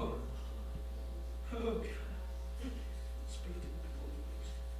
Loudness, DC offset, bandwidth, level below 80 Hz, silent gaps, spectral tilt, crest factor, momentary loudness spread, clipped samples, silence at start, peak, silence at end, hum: -44 LUFS; under 0.1%; 15.5 kHz; -42 dBFS; none; -6.5 dB/octave; 16 dB; 6 LU; under 0.1%; 0 s; -24 dBFS; 0 s; none